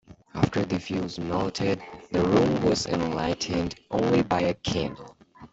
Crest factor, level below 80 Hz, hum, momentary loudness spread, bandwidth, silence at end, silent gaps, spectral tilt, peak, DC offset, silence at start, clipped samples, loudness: 20 dB; -50 dBFS; none; 8 LU; 8.2 kHz; 0.05 s; none; -6 dB/octave; -6 dBFS; under 0.1%; 0.1 s; under 0.1%; -26 LUFS